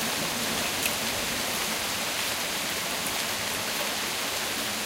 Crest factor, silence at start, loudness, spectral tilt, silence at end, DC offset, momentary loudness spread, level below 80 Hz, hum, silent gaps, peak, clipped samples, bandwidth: 18 dB; 0 s; -27 LUFS; -1 dB/octave; 0 s; under 0.1%; 2 LU; -56 dBFS; none; none; -10 dBFS; under 0.1%; 16 kHz